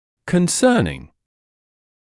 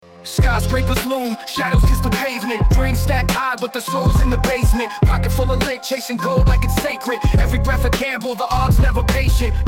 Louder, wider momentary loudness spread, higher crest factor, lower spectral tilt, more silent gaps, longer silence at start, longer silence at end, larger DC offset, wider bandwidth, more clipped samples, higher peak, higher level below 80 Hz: about the same, -18 LUFS vs -18 LUFS; first, 11 LU vs 6 LU; first, 18 dB vs 12 dB; about the same, -5 dB/octave vs -5.5 dB/octave; neither; about the same, 0.25 s vs 0.15 s; first, 1.1 s vs 0 s; neither; second, 12 kHz vs 17 kHz; neither; about the same, -4 dBFS vs -4 dBFS; second, -48 dBFS vs -20 dBFS